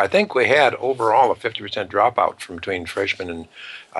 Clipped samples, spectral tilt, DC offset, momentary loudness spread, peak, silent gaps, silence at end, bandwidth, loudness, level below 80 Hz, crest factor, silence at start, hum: under 0.1%; -4.5 dB/octave; under 0.1%; 15 LU; -4 dBFS; none; 0 s; 12 kHz; -19 LUFS; -58 dBFS; 16 dB; 0 s; none